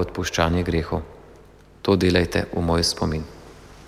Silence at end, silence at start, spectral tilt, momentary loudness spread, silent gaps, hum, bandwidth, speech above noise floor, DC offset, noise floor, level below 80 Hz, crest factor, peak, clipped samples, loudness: 0 s; 0 s; -5 dB/octave; 12 LU; none; none; 15.5 kHz; 27 dB; under 0.1%; -48 dBFS; -38 dBFS; 20 dB; -4 dBFS; under 0.1%; -22 LUFS